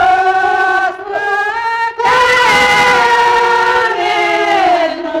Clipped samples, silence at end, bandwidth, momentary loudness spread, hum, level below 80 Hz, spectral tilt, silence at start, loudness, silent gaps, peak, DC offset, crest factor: under 0.1%; 0 s; 17.5 kHz; 7 LU; none; -44 dBFS; -2.5 dB/octave; 0 s; -11 LUFS; none; -2 dBFS; under 0.1%; 10 dB